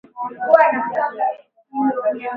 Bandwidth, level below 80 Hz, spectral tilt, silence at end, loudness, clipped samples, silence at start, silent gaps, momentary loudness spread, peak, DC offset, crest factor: 5 kHz; -68 dBFS; -7.5 dB/octave; 0 s; -18 LUFS; under 0.1%; 0.15 s; none; 17 LU; 0 dBFS; under 0.1%; 18 dB